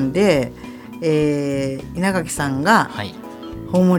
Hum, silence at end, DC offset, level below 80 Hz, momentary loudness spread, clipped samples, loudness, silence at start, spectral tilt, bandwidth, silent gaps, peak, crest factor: none; 0 s; under 0.1%; -44 dBFS; 17 LU; under 0.1%; -19 LUFS; 0 s; -6 dB/octave; 18 kHz; none; 0 dBFS; 18 dB